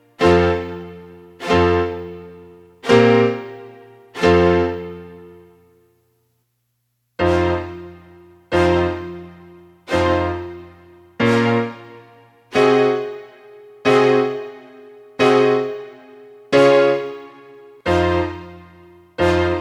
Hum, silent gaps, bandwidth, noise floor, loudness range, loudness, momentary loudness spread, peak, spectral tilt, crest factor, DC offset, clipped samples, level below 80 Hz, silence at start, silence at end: none; none; 12 kHz; -70 dBFS; 4 LU; -17 LUFS; 22 LU; 0 dBFS; -6.5 dB/octave; 18 dB; under 0.1%; under 0.1%; -42 dBFS; 0.2 s; 0 s